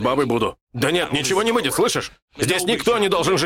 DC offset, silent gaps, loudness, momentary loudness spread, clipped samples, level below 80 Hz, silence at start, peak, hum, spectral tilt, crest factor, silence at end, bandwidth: under 0.1%; 0.61-0.67 s, 2.22-2.28 s; -20 LUFS; 7 LU; under 0.1%; -50 dBFS; 0 s; -6 dBFS; none; -3.5 dB/octave; 14 dB; 0 s; 17 kHz